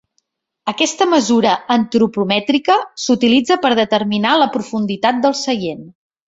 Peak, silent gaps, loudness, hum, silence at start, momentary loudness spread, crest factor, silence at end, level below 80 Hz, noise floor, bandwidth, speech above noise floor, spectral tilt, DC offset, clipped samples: -2 dBFS; none; -15 LUFS; none; 0.65 s; 8 LU; 14 dB; 0.4 s; -58 dBFS; -68 dBFS; 8 kHz; 53 dB; -4 dB/octave; under 0.1%; under 0.1%